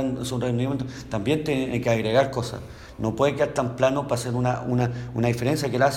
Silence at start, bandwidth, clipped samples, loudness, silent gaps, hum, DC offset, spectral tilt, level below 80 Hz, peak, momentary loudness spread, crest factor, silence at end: 0 s; 16 kHz; under 0.1%; -25 LUFS; none; none; under 0.1%; -6 dB/octave; -48 dBFS; -8 dBFS; 8 LU; 16 dB; 0 s